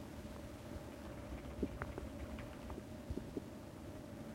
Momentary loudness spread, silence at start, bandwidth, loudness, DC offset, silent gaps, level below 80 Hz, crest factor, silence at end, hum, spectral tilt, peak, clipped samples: 6 LU; 0 s; 16 kHz; -49 LUFS; under 0.1%; none; -54 dBFS; 24 dB; 0 s; none; -6.5 dB/octave; -22 dBFS; under 0.1%